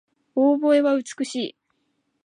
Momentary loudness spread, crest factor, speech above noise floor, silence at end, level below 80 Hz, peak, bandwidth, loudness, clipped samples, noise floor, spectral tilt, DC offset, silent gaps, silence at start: 12 LU; 14 dB; 52 dB; 0.75 s; -82 dBFS; -8 dBFS; 10 kHz; -22 LUFS; under 0.1%; -72 dBFS; -4 dB/octave; under 0.1%; none; 0.35 s